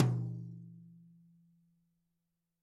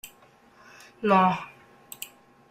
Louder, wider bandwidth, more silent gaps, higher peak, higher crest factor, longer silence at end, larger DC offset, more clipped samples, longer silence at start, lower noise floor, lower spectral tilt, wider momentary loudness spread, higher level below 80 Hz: second, -39 LUFS vs -24 LUFS; second, 7.2 kHz vs 16 kHz; neither; second, -12 dBFS vs -8 dBFS; about the same, 26 dB vs 22 dB; first, 1.75 s vs 0.45 s; neither; neither; about the same, 0 s vs 0.05 s; first, -85 dBFS vs -57 dBFS; first, -8.5 dB/octave vs -5.5 dB/octave; about the same, 24 LU vs 24 LU; second, -84 dBFS vs -70 dBFS